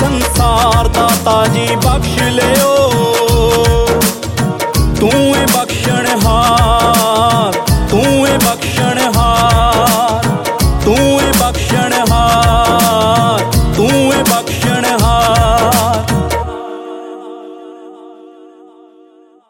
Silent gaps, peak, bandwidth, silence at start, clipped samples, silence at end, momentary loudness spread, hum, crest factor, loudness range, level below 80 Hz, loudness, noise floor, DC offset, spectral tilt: none; 0 dBFS; 17 kHz; 0 s; under 0.1%; 1.2 s; 5 LU; none; 12 dB; 3 LU; -22 dBFS; -11 LUFS; -44 dBFS; under 0.1%; -4.5 dB/octave